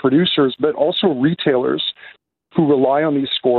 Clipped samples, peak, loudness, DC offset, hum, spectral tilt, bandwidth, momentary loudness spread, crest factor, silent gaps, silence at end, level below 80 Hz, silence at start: under 0.1%; -4 dBFS; -17 LUFS; under 0.1%; none; -4 dB/octave; 4.5 kHz; 7 LU; 14 dB; none; 0 s; -58 dBFS; 0.05 s